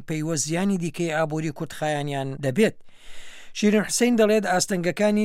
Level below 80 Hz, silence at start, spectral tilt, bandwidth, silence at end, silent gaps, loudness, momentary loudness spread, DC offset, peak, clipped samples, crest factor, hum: -54 dBFS; 0 s; -4.5 dB/octave; 16 kHz; 0 s; none; -23 LUFS; 9 LU; under 0.1%; -8 dBFS; under 0.1%; 16 dB; none